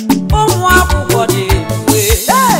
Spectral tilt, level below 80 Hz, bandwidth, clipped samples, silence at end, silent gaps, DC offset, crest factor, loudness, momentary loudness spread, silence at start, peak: -4 dB/octave; -20 dBFS; 16.5 kHz; 0.1%; 0 s; none; under 0.1%; 10 dB; -11 LUFS; 4 LU; 0 s; 0 dBFS